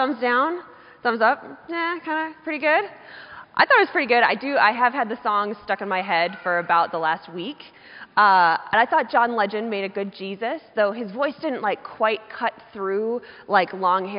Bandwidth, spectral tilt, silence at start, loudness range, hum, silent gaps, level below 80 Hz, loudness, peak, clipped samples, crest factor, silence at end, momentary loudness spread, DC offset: 5.4 kHz; -1 dB/octave; 0 s; 5 LU; none; none; -70 dBFS; -22 LUFS; -4 dBFS; under 0.1%; 20 dB; 0 s; 13 LU; under 0.1%